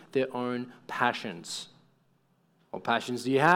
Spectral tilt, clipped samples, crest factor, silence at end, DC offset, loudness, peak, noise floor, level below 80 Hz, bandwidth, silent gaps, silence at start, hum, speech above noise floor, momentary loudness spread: -4.5 dB/octave; under 0.1%; 22 dB; 0 s; under 0.1%; -31 LUFS; -8 dBFS; -68 dBFS; -78 dBFS; 17.5 kHz; none; 0 s; none; 40 dB; 10 LU